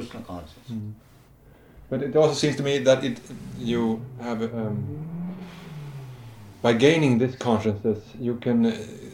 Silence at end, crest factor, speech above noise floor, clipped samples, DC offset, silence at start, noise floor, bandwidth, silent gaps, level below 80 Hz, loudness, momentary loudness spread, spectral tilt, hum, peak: 0 s; 22 dB; 28 dB; under 0.1%; under 0.1%; 0 s; -52 dBFS; 15.5 kHz; none; -56 dBFS; -24 LUFS; 19 LU; -6 dB/octave; none; -4 dBFS